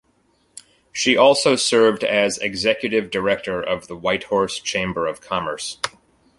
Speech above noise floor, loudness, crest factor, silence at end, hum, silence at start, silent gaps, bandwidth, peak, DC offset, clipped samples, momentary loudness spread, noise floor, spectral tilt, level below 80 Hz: 43 dB; -20 LUFS; 20 dB; 0.5 s; none; 0.55 s; none; 11.5 kHz; -2 dBFS; under 0.1%; under 0.1%; 11 LU; -62 dBFS; -3 dB/octave; -54 dBFS